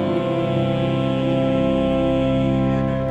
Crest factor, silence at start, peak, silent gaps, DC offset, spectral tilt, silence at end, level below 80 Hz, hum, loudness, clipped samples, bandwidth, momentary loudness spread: 10 dB; 0 s; -8 dBFS; none; under 0.1%; -8.5 dB/octave; 0 s; -36 dBFS; none; -20 LUFS; under 0.1%; 8.4 kHz; 2 LU